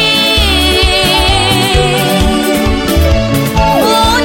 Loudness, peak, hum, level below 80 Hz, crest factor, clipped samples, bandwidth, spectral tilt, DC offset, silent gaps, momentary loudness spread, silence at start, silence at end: -9 LUFS; 0 dBFS; none; -18 dBFS; 10 dB; under 0.1%; 17 kHz; -4 dB/octave; under 0.1%; none; 3 LU; 0 s; 0 s